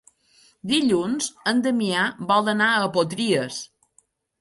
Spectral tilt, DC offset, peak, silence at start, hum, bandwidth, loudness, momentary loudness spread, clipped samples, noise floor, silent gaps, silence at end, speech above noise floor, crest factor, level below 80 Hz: -4 dB/octave; under 0.1%; -8 dBFS; 0.65 s; none; 11.5 kHz; -22 LUFS; 10 LU; under 0.1%; -63 dBFS; none; 0.75 s; 41 dB; 16 dB; -66 dBFS